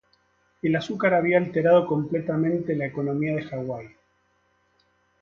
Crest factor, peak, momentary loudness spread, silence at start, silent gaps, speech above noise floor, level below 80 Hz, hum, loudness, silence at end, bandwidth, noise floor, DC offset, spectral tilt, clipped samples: 18 dB; -8 dBFS; 12 LU; 0.65 s; none; 44 dB; -64 dBFS; none; -24 LUFS; 1.35 s; 7 kHz; -67 dBFS; under 0.1%; -8 dB/octave; under 0.1%